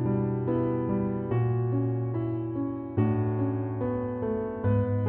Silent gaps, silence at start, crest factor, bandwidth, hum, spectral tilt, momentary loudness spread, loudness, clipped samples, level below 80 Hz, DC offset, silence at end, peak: none; 0 s; 14 dB; 3.2 kHz; none; -11 dB/octave; 4 LU; -29 LUFS; under 0.1%; -52 dBFS; under 0.1%; 0 s; -12 dBFS